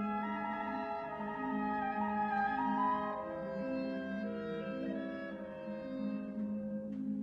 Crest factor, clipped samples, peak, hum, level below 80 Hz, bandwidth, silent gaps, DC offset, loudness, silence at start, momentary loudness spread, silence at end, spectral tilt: 14 dB; under 0.1%; -24 dBFS; none; -68 dBFS; 6 kHz; none; under 0.1%; -38 LUFS; 0 s; 7 LU; 0 s; -8.5 dB/octave